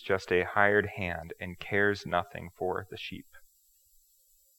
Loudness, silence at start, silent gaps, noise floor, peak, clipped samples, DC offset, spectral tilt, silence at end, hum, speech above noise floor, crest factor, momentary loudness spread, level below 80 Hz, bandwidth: -30 LUFS; 0 s; none; -66 dBFS; -8 dBFS; under 0.1%; under 0.1%; -5.5 dB/octave; 1.2 s; none; 35 dB; 24 dB; 16 LU; -64 dBFS; 17.5 kHz